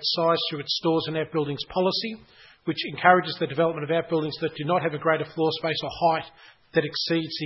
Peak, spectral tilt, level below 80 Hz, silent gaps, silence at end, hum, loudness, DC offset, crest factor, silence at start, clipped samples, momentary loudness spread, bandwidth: -2 dBFS; -6 dB/octave; -62 dBFS; none; 0 s; none; -25 LUFS; under 0.1%; 22 dB; 0 s; under 0.1%; 8 LU; 6 kHz